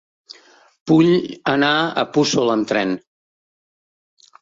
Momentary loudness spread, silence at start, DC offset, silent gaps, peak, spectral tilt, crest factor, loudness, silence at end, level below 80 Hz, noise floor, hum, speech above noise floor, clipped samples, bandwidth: 9 LU; 0.85 s; under 0.1%; none; -2 dBFS; -5 dB/octave; 18 dB; -17 LUFS; 1.45 s; -60 dBFS; -46 dBFS; none; 29 dB; under 0.1%; 7.8 kHz